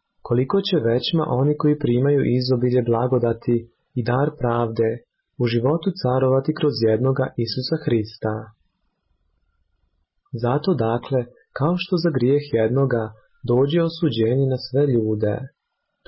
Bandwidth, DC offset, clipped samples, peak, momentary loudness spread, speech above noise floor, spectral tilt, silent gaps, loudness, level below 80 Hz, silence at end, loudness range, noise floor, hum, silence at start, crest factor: 5.8 kHz; under 0.1%; under 0.1%; -10 dBFS; 7 LU; 49 dB; -11.5 dB/octave; none; -21 LUFS; -54 dBFS; 0.6 s; 7 LU; -69 dBFS; none; 0.25 s; 12 dB